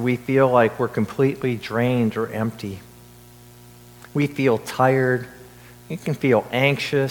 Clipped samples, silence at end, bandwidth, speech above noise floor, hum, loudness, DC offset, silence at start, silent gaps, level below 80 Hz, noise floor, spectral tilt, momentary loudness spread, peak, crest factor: under 0.1%; 0 s; 19 kHz; 26 dB; 60 Hz at -50 dBFS; -21 LUFS; under 0.1%; 0 s; none; -56 dBFS; -46 dBFS; -6.5 dB/octave; 12 LU; -2 dBFS; 20 dB